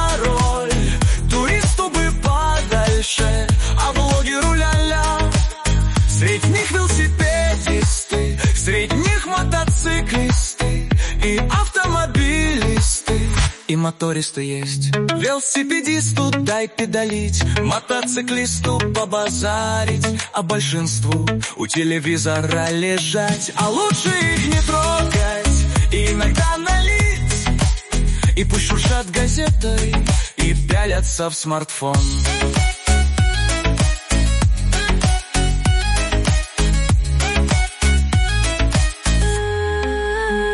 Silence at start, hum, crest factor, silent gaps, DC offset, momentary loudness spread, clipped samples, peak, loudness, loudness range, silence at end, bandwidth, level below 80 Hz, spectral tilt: 0 s; none; 12 dB; none; under 0.1%; 3 LU; under 0.1%; -4 dBFS; -18 LUFS; 2 LU; 0 s; 11.5 kHz; -20 dBFS; -4.5 dB/octave